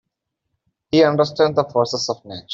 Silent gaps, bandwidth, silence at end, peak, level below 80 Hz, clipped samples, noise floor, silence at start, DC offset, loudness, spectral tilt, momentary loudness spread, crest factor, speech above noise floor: none; 7.8 kHz; 0 s; -2 dBFS; -58 dBFS; under 0.1%; -78 dBFS; 0.95 s; under 0.1%; -18 LUFS; -5 dB/octave; 9 LU; 18 dB; 60 dB